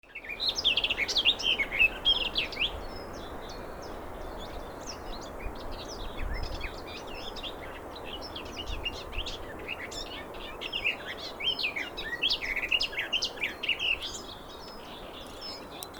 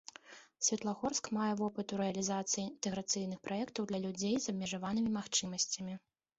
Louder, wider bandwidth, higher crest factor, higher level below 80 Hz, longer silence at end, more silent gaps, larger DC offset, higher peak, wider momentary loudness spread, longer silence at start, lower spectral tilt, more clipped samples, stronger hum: first, -30 LUFS vs -36 LUFS; first, over 20 kHz vs 8.2 kHz; about the same, 22 dB vs 20 dB; first, -46 dBFS vs -72 dBFS; second, 0 s vs 0.4 s; neither; neither; first, -12 dBFS vs -16 dBFS; first, 17 LU vs 6 LU; second, 0.05 s vs 0.25 s; second, -2 dB/octave vs -3.5 dB/octave; neither; neither